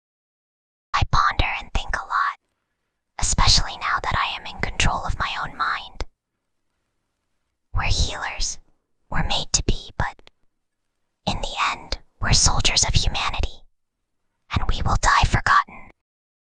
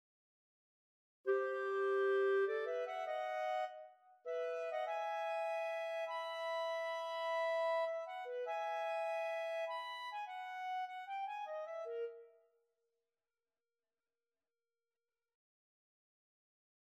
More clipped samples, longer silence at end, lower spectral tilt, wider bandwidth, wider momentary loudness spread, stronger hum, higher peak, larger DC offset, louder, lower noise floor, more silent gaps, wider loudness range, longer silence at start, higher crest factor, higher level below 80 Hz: neither; second, 0.65 s vs 4.65 s; first, -2.5 dB/octave vs -1 dB/octave; second, 10 kHz vs 13.5 kHz; first, 13 LU vs 9 LU; neither; first, -2 dBFS vs -26 dBFS; neither; first, -22 LUFS vs -40 LUFS; second, -76 dBFS vs under -90 dBFS; neither; second, 6 LU vs 10 LU; second, 0.95 s vs 1.25 s; about the same, 20 dB vs 16 dB; first, -28 dBFS vs under -90 dBFS